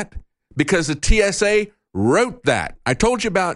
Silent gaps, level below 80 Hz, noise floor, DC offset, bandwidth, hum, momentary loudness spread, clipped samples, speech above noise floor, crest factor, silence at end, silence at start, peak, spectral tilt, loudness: none; -28 dBFS; -38 dBFS; under 0.1%; 11.5 kHz; none; 7 LU; under 0.1%; 20 dB; 18 dB; 0 s; 0 s; -2 dBFS; -4.5 dB/octave; -19 LUFS